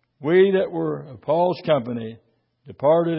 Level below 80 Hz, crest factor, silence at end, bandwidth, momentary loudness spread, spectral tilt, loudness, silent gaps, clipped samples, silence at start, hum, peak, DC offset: -64 dBFS; 16 dB; 0 s; 5.8 kHz; 14 LU; -11.5 dB/octave; -21 LUFS; none; under 0.1%; 0.2 s; none; -6 dBFS; under 0.1%